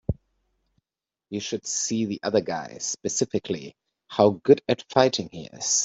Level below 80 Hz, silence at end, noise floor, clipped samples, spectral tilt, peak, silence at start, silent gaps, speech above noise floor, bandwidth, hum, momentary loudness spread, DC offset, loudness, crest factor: -52 dBFS; 0 s; under -90 dBFS; under 0.1%; -3.5 dB/octave; -2 dBFS; 0.1 s; none; over 66 dB; 8.2 kHz; none; 13 LU; under 0.1%; -25 LUFS; 22 dB